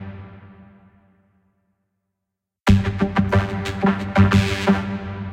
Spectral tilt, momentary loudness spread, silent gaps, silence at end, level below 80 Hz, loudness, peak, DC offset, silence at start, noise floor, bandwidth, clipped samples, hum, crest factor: -7 dB/octave; 12 LU; none; 0 s; -36 dBFS; -20 LUFS; -2 dBFS; under 0.1%; 0 s; -82 dBFS; 11 kHz; under 0.1%; none; 20 dB